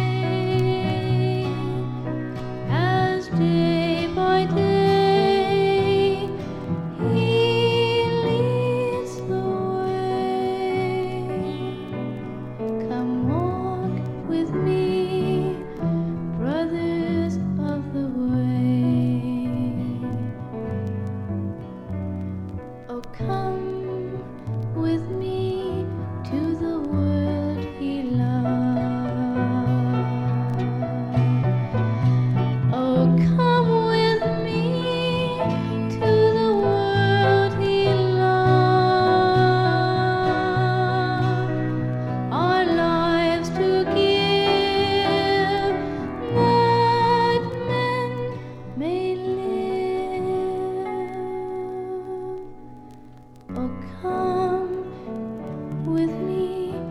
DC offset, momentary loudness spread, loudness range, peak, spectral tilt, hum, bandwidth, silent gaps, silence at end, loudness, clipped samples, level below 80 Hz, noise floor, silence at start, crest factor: under 0.1%; 12 LU; 9 LU; -6 dBFS; -7.5 dB/octave; none; 11 kHz; none; 0 s; -22 LUFS; under 0.1%; -48 dBFS; -44 dBFS; 0 s; 16 dB